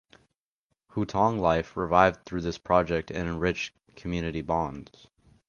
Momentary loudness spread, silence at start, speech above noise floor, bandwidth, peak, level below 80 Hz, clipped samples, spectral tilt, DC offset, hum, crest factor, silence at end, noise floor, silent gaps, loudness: 13 LU; 0.95 s; 54 dB; 7.2 kHz; -4 dBFS; -48 dBFS; under 0.1%; -6.5 dB/octave; under 0.1%; none; 24 dB; 0.65 s; -81 dBFS; none; -27 LUFS